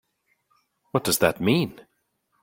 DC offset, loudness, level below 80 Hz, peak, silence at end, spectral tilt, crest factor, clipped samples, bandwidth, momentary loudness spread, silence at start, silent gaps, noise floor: under 0.1%; -23 LUFS; -58 dBFS; -4 dBFS; 0.6 s; -4.5 dB/octave; 24 dB; under 0.1%; 16.5 kHz; 8 LU; 0.95 s; none; -73 dBFS